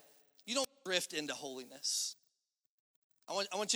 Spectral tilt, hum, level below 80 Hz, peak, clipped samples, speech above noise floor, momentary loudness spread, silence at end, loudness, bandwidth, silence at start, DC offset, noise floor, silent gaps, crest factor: -0.5 dB/octave; none; under -90 dBFS; -14 dBFS; under 0.1%; 46 dB; 10 LU; 0 s; -38 LUFS; over 20 kHz; 0.45 s; under 0.1%; -85 dBFS; 2.69-3.10 s; 26 dB